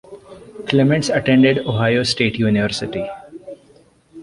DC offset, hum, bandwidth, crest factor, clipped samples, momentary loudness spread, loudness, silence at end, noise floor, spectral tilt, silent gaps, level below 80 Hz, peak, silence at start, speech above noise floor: under 0.1%; none; 11.5 kHz; 16 dB; under 0.1%; 21 LU; -17 LUFS; 0 s; -51 dBFS; -5.5 dB/octave; none; -48 dBFS; -2 dBFS; 0.1 s; 35 dB